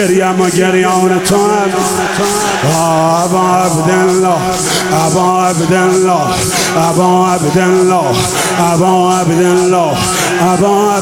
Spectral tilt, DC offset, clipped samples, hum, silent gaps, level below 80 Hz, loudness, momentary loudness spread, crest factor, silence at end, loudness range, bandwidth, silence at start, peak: -4.5 dB/octave; under 0.1%; under 0.1%; none; none; -42 dBFS; -10 LUFS; 2 LU; 10 dB; 0 s; 1 LU; 17 kHz; 0 s; 0 dBFS